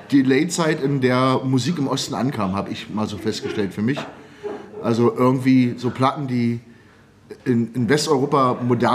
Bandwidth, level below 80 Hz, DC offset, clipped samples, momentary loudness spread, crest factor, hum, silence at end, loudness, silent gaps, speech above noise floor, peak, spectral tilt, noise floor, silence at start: 15 kHz; -60 dBFS; under 0.1%; under 0.1%; 10 LU; 18 dB; none; 0 s; -20 LUFS; none; 30 dB; -2 dBFS; -6 dB/octave; -50 dBFS; 0 s